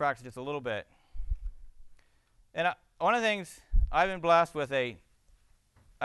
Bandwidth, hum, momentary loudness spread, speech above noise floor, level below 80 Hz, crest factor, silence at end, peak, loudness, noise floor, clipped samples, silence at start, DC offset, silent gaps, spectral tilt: 12.5 kHz; none; 16 LU; 35 dB; -38 dBFS; 20 dB; 0 s; -12 dBFS; -31 LUFS; -65 dBFS; under 0.1%; 0 s; under 0.1%; none; -5 dB/octave